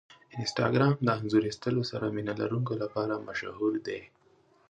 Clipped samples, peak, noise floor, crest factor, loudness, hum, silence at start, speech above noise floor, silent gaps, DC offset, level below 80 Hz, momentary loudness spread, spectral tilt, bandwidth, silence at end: under 0.1%; -10 dBFS; -64 dBFS; 20 dB; -30 LUFS; none; 0.1 s; 35 dB; none; under 0.1%; -64 dBFS; 10 LU; -6.5 dB/octave; 9.2 kHz; 0.65 s